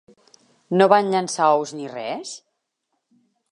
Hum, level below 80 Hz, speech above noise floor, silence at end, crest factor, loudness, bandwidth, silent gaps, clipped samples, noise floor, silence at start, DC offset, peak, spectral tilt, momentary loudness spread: none; -78 dBFS; 57 dB; 1.15 s; 22 dB; -20 LUFS; 11 kHz; none; under 0.1%; -76 dBFS; 0.7 s; under 0.1%; -2 dBFS; -4.5 dB/octave; 16 LU